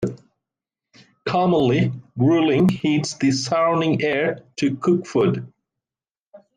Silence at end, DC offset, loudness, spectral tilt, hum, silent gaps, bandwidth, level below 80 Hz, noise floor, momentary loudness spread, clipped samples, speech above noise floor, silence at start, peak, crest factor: 0.2 s; under 0.1%; -20 LUFS; -6 dB/octave; none; 6.20-6.32 s; 10 kHz; -58 dBFS; under -90 dBFS; 7 LU; under 0.1%; over 71 dB; 0 s; -8 dBFS; 14 dB